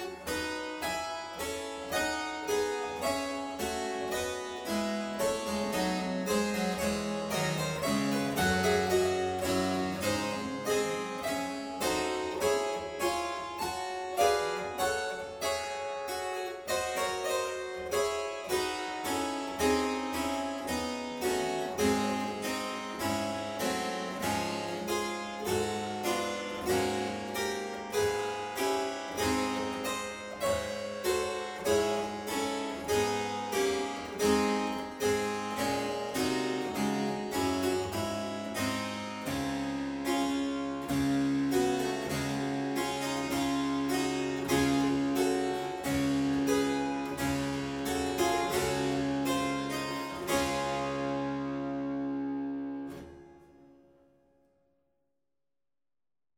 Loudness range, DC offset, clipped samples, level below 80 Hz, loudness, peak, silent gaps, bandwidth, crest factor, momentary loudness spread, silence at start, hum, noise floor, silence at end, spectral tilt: 4 LU; under 0.1%; under 0.1%; -56 dBFS; -32 LUFS; -14 dBFS; none; 19.5 kHz; 18 dB; 6 LU; 0 s; none; under -90 dBFS; 2.7 s; -4 dB/octave